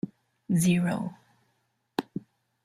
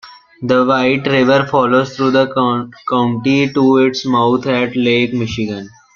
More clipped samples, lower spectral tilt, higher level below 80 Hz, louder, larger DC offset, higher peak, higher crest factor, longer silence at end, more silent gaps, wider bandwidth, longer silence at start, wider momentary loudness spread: neither; about the same, -6 dB/octave vs -6.5 dB/octave; second, -66 dBFS vs -52 dBFS; second, -29 LUFS vs -14 LUFS; neither; second, -10 dBFS vs -2 dBFS; first, 20 dB vs 12 dB; first, 0.45 s vs 0.25 s; neither; first, 14.5 kHz vs 7 kHz; about the same, 0.05 s vs 0.05 s; first, 17 LU vs 8 LU